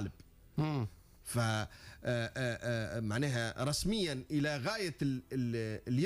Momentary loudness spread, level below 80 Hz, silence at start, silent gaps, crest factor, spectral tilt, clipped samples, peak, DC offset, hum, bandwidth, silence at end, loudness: 7 LU; -56 dBFS; 0 s; none; 12 dB; -5.5 dB/octave; under 0.1%; -24 dBFS; under 0.1%; none; 15.5 kHz; 0 s; -36 LUFS